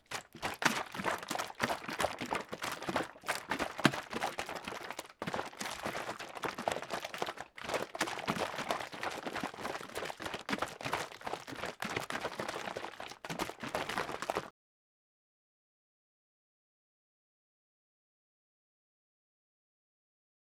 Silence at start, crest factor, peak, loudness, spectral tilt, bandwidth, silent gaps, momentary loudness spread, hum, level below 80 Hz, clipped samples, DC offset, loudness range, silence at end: 0.1 s; 32 dB; -8 dBFS; -38 LUFS; -3 dB/octave; over 20 kHz; none; 8 LU; none; -68 dBFS; under 0.1%; under 0.1%; 6 LU; 6 s